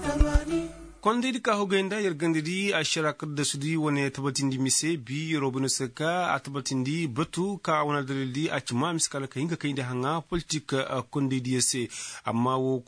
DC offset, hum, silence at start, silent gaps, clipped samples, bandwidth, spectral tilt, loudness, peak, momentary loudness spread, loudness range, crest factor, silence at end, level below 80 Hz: under 0.1%; none; 0 s; none; under 0.1%; 10.5 kHz; -4 dB/octave; -28 LUFS; -8 dBFS; 6 LU; 2 LU; 20 dB; 0.05 s; -40 dBFS